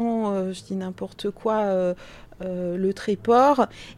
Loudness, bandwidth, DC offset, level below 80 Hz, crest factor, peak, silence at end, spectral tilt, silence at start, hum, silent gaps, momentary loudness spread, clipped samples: -24 LUFS; 12.5 kHz; under 0.1%; -54 dBFS; 18 dB; -6 dBFS; 0 s; -6.5 dB/octave; 0 s; none; none; 14 LU; under 0.1%